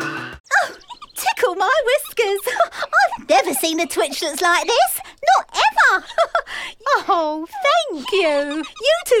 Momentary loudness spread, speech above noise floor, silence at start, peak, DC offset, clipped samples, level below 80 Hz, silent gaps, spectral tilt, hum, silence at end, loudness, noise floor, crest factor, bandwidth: 8 LU; 19 dB; 0 s; -4 dBFS; under 0.1%; under 0.1%; -56 dBFS; 0.40-0.44 s; -1 dB/octave; none; 0 s; -18 LUFS; -38 dBFS; 14 dB; 18 kHz